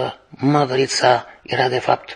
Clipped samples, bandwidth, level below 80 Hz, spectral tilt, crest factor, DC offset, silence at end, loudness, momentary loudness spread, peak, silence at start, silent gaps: under 0.1%; 10 kHz; -62 dBFS; -4.5 dB/octave; 18 dB; under 0.1%; 0 s; -18 LUFS; 7 LU; 0 dBFS; 0 s; none